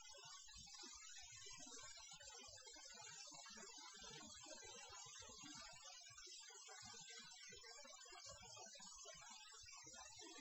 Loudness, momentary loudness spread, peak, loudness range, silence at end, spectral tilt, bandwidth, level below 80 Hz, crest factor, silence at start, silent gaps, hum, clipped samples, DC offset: -57 LUFS; 2 LU; -44 dBFS; 1 LU; 0 s; -0.5 dB/octave; 8 kHz; -80 dBFS; 16 dB; 0 s; none; none; under 0.1%; under 0.1%